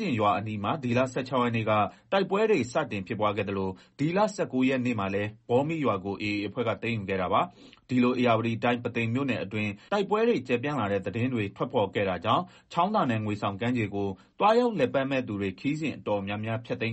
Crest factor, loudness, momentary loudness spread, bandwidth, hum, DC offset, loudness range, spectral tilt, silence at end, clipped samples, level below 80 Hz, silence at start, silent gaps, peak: 16 dB; -28 LUFS; 6 LU; 8.4 kHz; none; under 0.1%; 1 LU; -7 dB/octave; 0 s; under 0.1%; -64 dBFS; 0 s; none; -12 dBFS